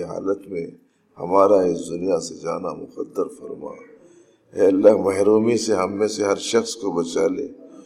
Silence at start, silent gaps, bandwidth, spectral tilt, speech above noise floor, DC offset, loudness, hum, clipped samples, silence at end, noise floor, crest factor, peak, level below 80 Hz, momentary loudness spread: 0 s; none; 13.5 kHz; -5 dB/octave; 32 dB; under 0.1%; -21 LUFS; none; under 0.1%; 0.05 s; -52 dBFS; 20 dB; 0 dBFS; -64 dBFS; 19 LU